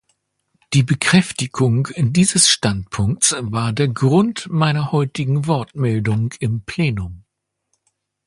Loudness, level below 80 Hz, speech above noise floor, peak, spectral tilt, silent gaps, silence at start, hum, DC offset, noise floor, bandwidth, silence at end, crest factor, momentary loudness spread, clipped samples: -18 LUFS; -44 dBFS; 55 dB; 0 dBFS; -4.5 dB/octave; none; 0.7 s; none; under 0.1%; -72 dBFS; 11.5 kHz; 1.05 s; 18 dB; 8 LU; under 0.1%